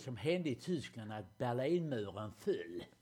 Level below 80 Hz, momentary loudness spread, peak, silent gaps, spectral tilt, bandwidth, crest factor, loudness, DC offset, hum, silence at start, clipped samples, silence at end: -74 dBFS; 11 LU; -22 dBFS; none; -6.5 dB/octave; 15.5 kHz; 16 dB; -40 LUFS; under 0.1%; none; 0 s; under 0.1%; 0.15 s